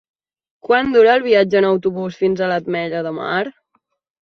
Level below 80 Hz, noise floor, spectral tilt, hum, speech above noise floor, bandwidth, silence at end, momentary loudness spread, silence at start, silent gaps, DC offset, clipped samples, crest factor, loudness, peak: -58 dBFS; -67 dBFS; -6.5 dB/octave; none; 51 dB; 6.4 kHz; 0.75 s; 11 LU; 0.65 s; none; under 0.1%; under 0.1%; 16 dB; -16 LUFS; -2 dBFS